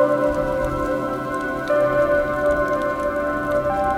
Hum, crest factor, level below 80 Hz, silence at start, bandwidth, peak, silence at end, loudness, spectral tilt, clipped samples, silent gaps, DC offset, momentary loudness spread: none; 14 dB; -38 dBFS; 0 s; 16 kHz; -6 dBFS; 0 s; -21 LUFS; -6.5 dB/octave; under 0.1%; none; under 0.1%; 6 LU